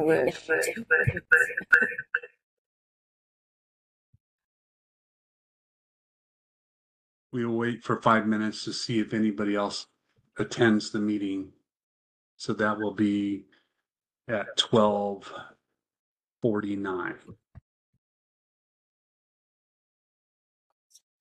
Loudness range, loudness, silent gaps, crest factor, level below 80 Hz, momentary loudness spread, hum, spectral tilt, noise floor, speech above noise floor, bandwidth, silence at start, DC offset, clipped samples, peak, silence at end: 10 LU; -27 LUFS; 2.43-4.13 s, 4.20-4.38 s, 4.44-7.30 s, 11.83-12.37 s, 15.99-16.16 s, 16.32-16.36 s; 24 dB; -64 dBFS; 15 LU; none; -5 dB/octave; -87 dBFS; 61 dB; 14 kHz; 0 s; under 0.1%; under 0.1%; -6 dBFS; 3.85 s